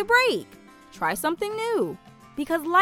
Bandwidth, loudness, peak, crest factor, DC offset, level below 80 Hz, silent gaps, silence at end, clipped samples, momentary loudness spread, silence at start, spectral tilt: 18.5 kHz; -25 LUFS; -6 dBFS; 18 dB; under 0.1%; -60 dBFS; none; 0 s; under 0.1%; 19 LU; 0 s; -3.5 dB/octave